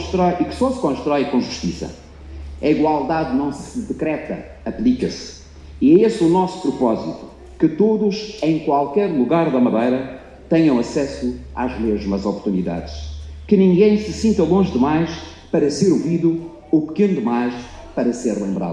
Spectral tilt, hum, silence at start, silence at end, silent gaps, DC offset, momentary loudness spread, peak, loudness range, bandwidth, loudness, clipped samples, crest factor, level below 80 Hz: -7 dB/octave; none; 0 s; 0 s; none; under 0.1%; 14 LU; -2 dBFS; 4 LU; 10.5 kHz; -19 LUFS; under 0.1%; 16 dB; -40 dBFS